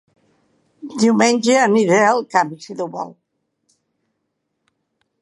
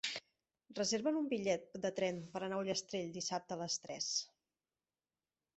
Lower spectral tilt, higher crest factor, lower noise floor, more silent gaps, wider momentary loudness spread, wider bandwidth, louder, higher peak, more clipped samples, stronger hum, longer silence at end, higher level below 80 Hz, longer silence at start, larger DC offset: first, -4.5 dB/octave vs -3 dB/octave; about the same, 18 dB vs 18 dB; second, -74 dBFS vs under -90 dBFS; neither; first, 17 LU vs 7 LU; first, 11.5 kHz vs 8.2 kHz; first, -16 LUFS vs -39 LUFS; first, 0 dBFS vs -22 dBFS; neither; neither; first, 2.1 s vs 1.3 s; first, -72 dBFS vs -80 dBFS; first, 0.85 s vs 0.05 s; neither